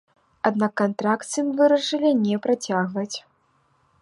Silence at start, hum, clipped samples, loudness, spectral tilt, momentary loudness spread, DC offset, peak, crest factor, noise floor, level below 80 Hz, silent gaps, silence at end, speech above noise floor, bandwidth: 0.45 s; none; under 0.1%; -22 LUFS; -5 dB/octave; 8 LU; under 0.1%; -4 dBFS; 20 dB; -65 dBFS; -72 dBFS; none; 0.85 s; 43 dB; 11.5 kHz